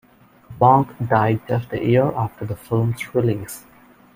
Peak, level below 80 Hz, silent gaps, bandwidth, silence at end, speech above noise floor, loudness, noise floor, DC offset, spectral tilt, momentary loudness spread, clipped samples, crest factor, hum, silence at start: -2 dBFS; -52 dBFS; none; 16 kHz; 0.55 s; 26 dB; -20 LUFS; -45 dBFS; under 0.1%; -7.5 dB/octave; 13 LU; under 0.1%; 18 dB; none; 0.5 s